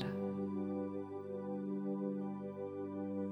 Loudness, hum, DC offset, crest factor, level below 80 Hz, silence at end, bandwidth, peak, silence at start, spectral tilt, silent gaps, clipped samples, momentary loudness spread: -42 LUFS; 50 Hz at -70 dBFS; under 0.1%; 18 dB; -82 dBFS; 0 s; 5 kHz; -22 dBFS; 0 s; -9.5 dB/octave; none; under 0.1%; 4 LU